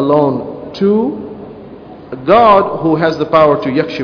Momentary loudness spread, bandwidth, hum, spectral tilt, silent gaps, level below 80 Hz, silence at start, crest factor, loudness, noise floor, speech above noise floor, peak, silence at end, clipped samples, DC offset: 21 LU; 5.4 kHz; none; -8 dB/octave; none; -46 dBFS; 0 s; 12 dB; -12 LUFS; -33 dBFS; 22 dB; 0 dBFS; 0 s; 0.3%; under 0.1%